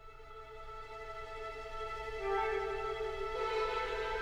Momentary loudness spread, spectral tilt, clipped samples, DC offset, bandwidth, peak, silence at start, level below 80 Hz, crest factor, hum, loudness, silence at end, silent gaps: 14 LU; -4 dB/octave; under 0.1%; under 0.1%; 12.5 kHz; -22 dBFS; 0 s; -50 dBFS; 16 dB; none; -38 LUFS; 0 s; none